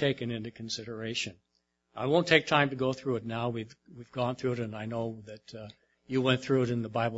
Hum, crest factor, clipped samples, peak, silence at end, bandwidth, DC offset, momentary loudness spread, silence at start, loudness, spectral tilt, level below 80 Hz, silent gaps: none; 24 dB; under 0.1%; -6 dBFS; 0 s; 8 kHz; under 0.1%; 21 LU; 0 s; -30 LUFS; -5.5 dB/octave; -66 dBFS; none